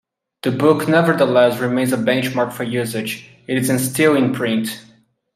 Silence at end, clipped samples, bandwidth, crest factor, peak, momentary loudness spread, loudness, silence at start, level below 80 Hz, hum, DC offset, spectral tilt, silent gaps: 0.55 s; under 0.1%; 16 kHz; 16 dB; -2 dBFS; 11 LU; -17 LUFS; 0.45 s; -62 dBFS; none; under 0.1%; -5 dB/octave; none